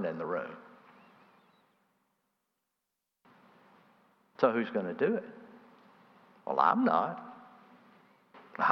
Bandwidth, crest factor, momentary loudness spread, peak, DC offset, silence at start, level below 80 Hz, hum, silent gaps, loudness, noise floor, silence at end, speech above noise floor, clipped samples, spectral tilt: 6.2 kHz; 26 dB; 23 LU; -8 dBFS; under 0.1%; 0 s; under -90 dBFS; none; none; -31 LUFS; -86 dBFS; 0 s; 56 dB; under 0.1%; -8 dB/octave